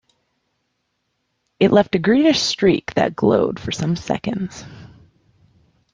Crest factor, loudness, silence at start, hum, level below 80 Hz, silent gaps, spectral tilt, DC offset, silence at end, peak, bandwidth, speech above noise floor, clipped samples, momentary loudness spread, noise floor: 18 dB; -18 LUFS; 1.6 s; none; -52 dBFS; none; -5.5 dB/octave; under 0.1%; 1.05 s; -2 dBFS; 9.8 kHz; 54 dB; under 0.1%; 12 LU; -72 dBFS